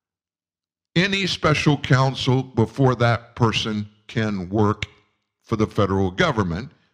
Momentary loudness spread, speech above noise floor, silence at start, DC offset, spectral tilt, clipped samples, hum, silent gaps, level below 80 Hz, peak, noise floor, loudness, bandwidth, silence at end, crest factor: 9 LU; over 70 dB; 0.95 s; under 0.1%; -6 dB/octave; under 0.1%; none; none; -48 dBFS; -4 dBFS; under -90 dBFS; -21 LUFS; 10.5 kHz; 0.25 s; 18 dB